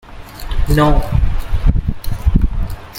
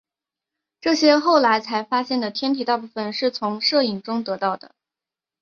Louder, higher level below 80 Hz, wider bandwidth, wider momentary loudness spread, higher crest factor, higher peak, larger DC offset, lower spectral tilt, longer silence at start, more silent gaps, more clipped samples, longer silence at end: first, -18 LUFS vs -21 LUFS; first, -16 dBFS vs -68 dBFS; first, 16.5 kHz vs 7.2 kHz; about the same, 12 LU vs 10 LU; about the same, 14 dB vs 18 dB; first, 0 dBFS vs -4 dBFS; neither; first, -7 dB/octave vs -4 dB/octave; second, 0.1 s vs 0.85 s; neither; neither; second, 0 s vs 0.85 s